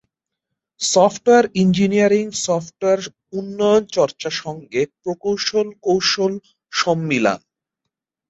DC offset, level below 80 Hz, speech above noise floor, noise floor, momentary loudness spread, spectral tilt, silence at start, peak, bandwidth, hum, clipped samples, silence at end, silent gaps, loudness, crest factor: under 0.1%; -58 dBFS; 63 dB; -81 dBFS; 10 LU; -4.5 dB/octave; 0.8 s; -2 dBFS; 8.4 kHz; none; under 0.1%; 0.95 s; none; -18 LUFS; 16 dB